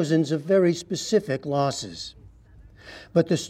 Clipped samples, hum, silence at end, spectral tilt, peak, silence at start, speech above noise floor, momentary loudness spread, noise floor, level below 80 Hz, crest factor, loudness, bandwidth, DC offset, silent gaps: under 0.1%; none; 0 s; -5.5 dB/octave; -8 dBFS; 0 s; 26 dB; 17 LU; -50 dBFS; -56 dBFS; 18 dB; -24 LUFS; 14.5 kHz; under 0.1%; none